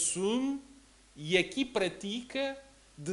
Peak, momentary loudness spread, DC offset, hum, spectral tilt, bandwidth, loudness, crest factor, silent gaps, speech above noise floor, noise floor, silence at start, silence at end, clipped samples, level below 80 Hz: -12 dBFS; 14 LU; under 0.1%; none; -3 dB/octave; 11.5 kHz; -32 LUFS; 22 dB; none; 26 dB; -58 dBFS; 0 s; 0 s; under 0.1%; -64 dBFS